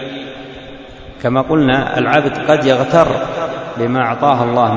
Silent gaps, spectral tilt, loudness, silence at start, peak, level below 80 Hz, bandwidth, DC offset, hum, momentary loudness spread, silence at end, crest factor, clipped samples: none; -6.5 dB/octave; -14 LUFS; 0 s; 0 dBFS; -42 dBFS; 8 kHz; under 0.1%; none; 19 LU; 0 s; 14 dB; under 0.1%